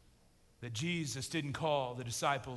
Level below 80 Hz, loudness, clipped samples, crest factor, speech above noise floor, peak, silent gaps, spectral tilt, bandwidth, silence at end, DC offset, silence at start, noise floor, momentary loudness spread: -64 dBFS; -37 LUFS; under 0.1%; 18 dB; 30 dB; -20 dBFS; none; -4 dB/octave; 12 kHz; 0 s; under 0.1%; 0.6 s; -67 dBFS; 6 LU